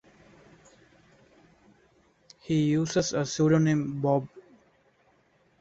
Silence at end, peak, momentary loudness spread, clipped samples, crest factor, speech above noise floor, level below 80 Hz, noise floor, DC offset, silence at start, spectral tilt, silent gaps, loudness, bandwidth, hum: 1.2 s; -10 dBFS; 7 LU; under 0.1%; 20 dB; 40 dB; -64 dBFS; -65 dBFS; under 0.1%; 2.45 s; -6 dB/octave; none; -26 LUFS; 8 kHz; none